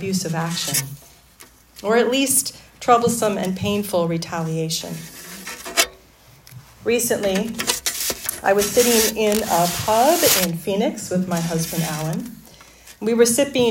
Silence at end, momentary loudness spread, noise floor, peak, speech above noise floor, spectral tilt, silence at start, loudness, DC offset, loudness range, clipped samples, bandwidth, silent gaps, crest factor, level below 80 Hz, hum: 0 s; 12 LU; -50 dBFS; 0 dBFS; 30 dB; -3.5 dB/octave; 0 s; -20 LUFS; under 0.1%; 6 LU; under 0.1%; 17 kHz; none; 20 dB; -52 dBFS; none